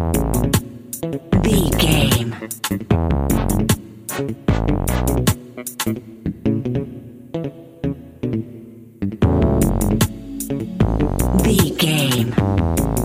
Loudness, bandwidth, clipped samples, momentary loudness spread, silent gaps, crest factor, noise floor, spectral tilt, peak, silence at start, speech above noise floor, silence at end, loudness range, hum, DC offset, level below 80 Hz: -19 LUFS; 16 kHz; under 0.1%; 12 LU; none; 18 dB; -39 dBFS; -5.5 dB/octave; 0 dBFS; 0 s; 20 dB; 0 s; 6 LU; none; under 0.1%; -28 dBFS